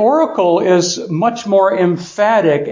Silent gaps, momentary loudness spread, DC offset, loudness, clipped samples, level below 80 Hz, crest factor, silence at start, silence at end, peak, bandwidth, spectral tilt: none; 5 LU; under 0.1%; -14 LUFS; under 0.1%; -62 dBFS; 12 dB; 0 s; 0 s; -2 dBFS; 7.6 kHz; -5 dB/octave